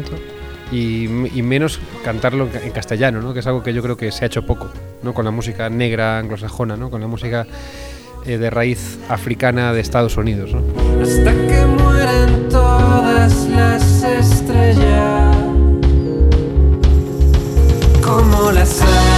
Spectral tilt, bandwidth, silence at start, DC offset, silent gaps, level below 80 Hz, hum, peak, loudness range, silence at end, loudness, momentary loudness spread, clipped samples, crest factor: -6.5 dB/octave; 14 kHz; 0 s; under 0.1%; none; -18 dBFS; none; -2 dBFS; 8 LU; 0 s; -15 LUFS; 12 LU; under 0.1%; 12 dB